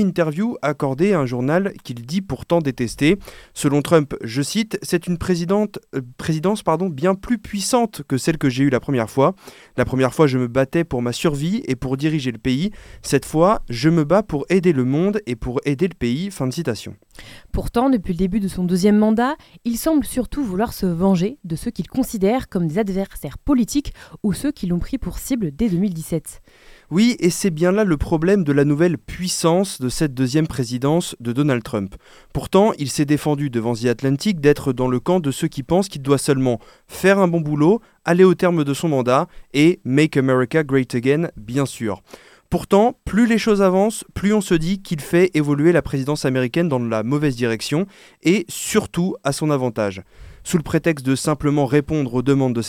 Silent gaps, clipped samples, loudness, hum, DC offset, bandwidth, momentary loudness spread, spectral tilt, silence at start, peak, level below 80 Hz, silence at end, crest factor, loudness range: none; under 0.1%; -19 LUFS; none; under 0.1%; 17 kHz; 9 LU; -6 dB/octave; 0 s; 0 dBFS; -40 dBFS; 0 s; 18 dB; 4 LU